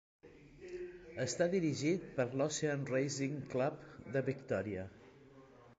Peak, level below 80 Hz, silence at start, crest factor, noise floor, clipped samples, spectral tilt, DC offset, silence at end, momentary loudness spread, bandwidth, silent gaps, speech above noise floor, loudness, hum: -20 dBFS; -68 dBFS; 0.25 s; 18 dB; -60 dBFS; under 0.1%; -5.5 dB/octave; under 0.1%; 0.05 s; 14 LU; 9 kHz; none; 24 dB; -38 LUFS; none